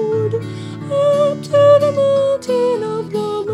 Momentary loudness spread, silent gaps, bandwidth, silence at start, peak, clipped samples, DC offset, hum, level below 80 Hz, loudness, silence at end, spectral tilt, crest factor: 11 LU; none; 11.5 kHz; 0 s; -2 dBFS; under 0.1%; under 0.1%; none; -60 dBFS; -16 LUFS; 0 s; -6.5 dB/octave; 14 dB